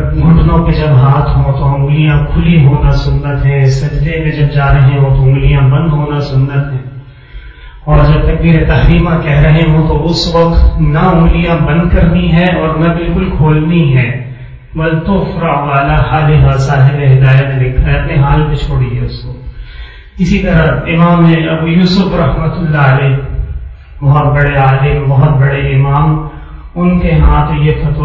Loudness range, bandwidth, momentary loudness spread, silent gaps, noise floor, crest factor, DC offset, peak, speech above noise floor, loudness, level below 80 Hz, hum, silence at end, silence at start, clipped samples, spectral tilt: 3 LU; 7.2 kHz; 9 LU; none; -29 dBFS; 8 dB; under 0.1%; 0 dBFS; 21 dB; -9 LUFS; -16 dBFS; none; 0 s; 0 s; 0.3%; -8.5 dB/octave